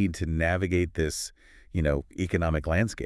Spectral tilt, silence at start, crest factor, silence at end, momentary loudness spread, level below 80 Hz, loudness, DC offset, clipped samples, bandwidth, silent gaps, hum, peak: -6 dB/octave; 0 s; 18 dB; 0 s; 6 LU; -40 dBFS; -28 LUFS; under 0.1%; under 0.1%; 12 kHz; none; none; -10 dBFS